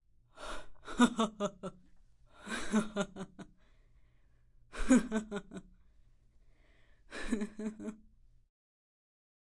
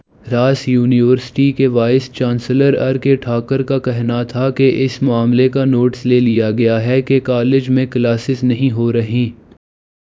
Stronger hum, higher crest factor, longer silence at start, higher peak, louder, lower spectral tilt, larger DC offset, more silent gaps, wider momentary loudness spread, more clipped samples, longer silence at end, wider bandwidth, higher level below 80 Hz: neither; first, 26 dB vs 14 dB; about the same, 0.35 s vs 0.25 s; second, -12 dBFS vs 0 dBFS; second, -35 LUFS vs -14 LUFS; second, -4.5 dB/octave vs -8 dB/octave; neither; neither; first, 21 LU vs 5 LU; neither; first, 1.55 s vs 0.85 s; first, 11.5 kHz vs 7.6 kHz; about the same, -52 dBFS vs -50 dBFS